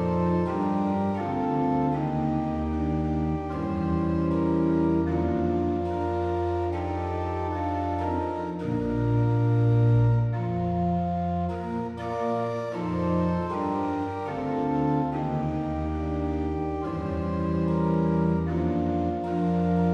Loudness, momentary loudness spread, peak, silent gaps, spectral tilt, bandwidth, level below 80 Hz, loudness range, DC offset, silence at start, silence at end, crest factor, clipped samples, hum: -27 LUFS; 6 LU; -12 dBFS; none; -10 dB/octave; 6.8 kHz; -44 dBFS; 3 LU; under 0.1%; 0 s; 0 s; 14 dB; under 0.1%; none